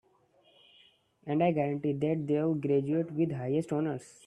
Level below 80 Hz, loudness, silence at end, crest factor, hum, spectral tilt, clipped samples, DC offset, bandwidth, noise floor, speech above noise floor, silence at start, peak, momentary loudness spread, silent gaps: -72 dBFS; -30 LUFS; 0.2 s; 18 dB; none; -8.5 dB/octave; under 0.1%; under 0.1%; 11 kHz; -66 dBFS; 36 dB; 1.25 s; -14 dBFS; 5 LU; none